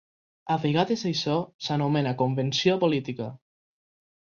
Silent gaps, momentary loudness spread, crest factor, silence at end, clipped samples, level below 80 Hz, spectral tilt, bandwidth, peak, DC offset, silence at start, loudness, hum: 1.54-1.59 s; 11 LU; 18 dB; 0.85 s; under 0.1%; -66 dBFS; -6 dB/octave; 7.2 kHz; -8 dBFS; under 0.1%; 0.45 s; -26 LUFS; none